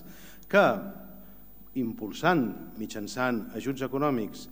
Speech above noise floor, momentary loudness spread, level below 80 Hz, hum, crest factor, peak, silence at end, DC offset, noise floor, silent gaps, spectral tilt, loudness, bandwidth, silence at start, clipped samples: 24 dB; 23 LU; -60 dBFS; none; 22 dB; -6 dBFS; 0 s; 0.4%; -52 dBFS; none; -5.5 dB/octave; -29 LUFS; 16.5 kHz; 0 s; under 0.1%